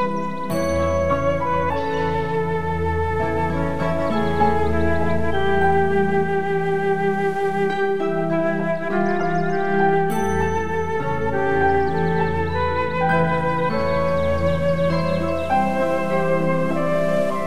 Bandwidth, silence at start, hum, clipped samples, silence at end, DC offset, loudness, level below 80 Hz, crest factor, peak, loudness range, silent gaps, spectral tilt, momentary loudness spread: 15 kHz; 0 s; none; under 0.1%; 0 s; 4%; -21 LUFS; -38 dBFS; 14 dB; -6 dBFS; 1 LU; none; -7 dB/octave; 4 LU